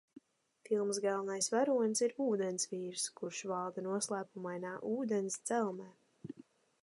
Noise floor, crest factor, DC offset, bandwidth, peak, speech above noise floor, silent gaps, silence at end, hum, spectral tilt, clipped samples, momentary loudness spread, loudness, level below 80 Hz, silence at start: -64 dBFS; 18 dB; under 0.1%; 11.5 kHz; -20 dBFS; 28 dB; none; 0.5 s; none; -3.5 dB/octave; under 0.1%; 17 LU; -36 LUFS; -88 dBFS; 0.7 s